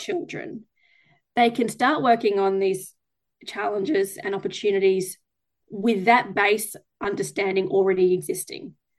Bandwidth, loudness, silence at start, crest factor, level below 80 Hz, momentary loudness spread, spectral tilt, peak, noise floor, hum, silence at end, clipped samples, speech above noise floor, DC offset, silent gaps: 12.5 kHz; -23 LUFS; 0 s; 20 dB; -68 dBFS; 16 LU; -4.5 dB/octave; -4 dBFS; -62 dBFS; none; 0.3 s; under 0.1%; 39 dB; under 0.1%; none